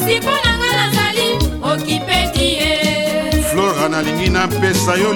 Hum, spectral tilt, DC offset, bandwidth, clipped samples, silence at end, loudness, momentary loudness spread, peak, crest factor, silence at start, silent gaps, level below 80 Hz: none; -4 dB/octave; under 0.1%; 19 kHz; under 0.1%; 0 s; -15 LUFS; 3 LU; -2 dBFS; 14 dB; 0 s; none; -28 dBFS